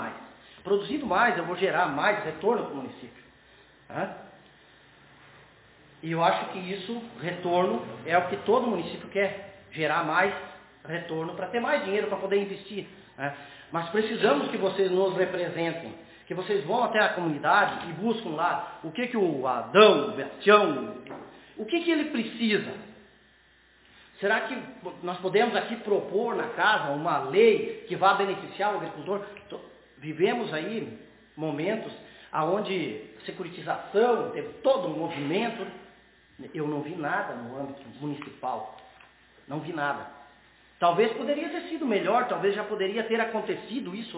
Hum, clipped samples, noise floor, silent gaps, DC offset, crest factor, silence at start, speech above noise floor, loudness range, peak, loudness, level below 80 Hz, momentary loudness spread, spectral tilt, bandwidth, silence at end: none; under 0.1%; -60 dBFS; none; under 0.1%; 24 dB; 0 s; 33 dB; 9 LU; -4 dBFS; -27 LUFS; -68 dBFS; 16 LU; -9 dB/octave; 4 kHz; 0 s